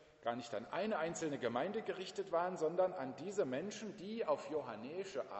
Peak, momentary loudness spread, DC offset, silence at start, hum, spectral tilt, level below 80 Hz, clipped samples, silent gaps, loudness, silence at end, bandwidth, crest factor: -22 dBFS; 8 LU; under 0.1%; 0 s; none; -5 dB/octave; -80 dBFS; under 0.1%; none; -41 LUFS; 0 s; 8.2 kHz; 18 dB